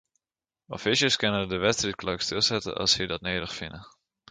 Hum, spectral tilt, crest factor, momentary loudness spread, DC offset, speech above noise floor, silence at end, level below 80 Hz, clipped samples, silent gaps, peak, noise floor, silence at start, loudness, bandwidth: none; -3 dB/octave; 20 dB; 13 LU; under 0.1%; over 63 dB; 0.4 s; -54 dBFS; under 0.1%; none; -10 dBFS; under -90 dBFS; 0.7 s; -26 LUFS; 9.6 kHz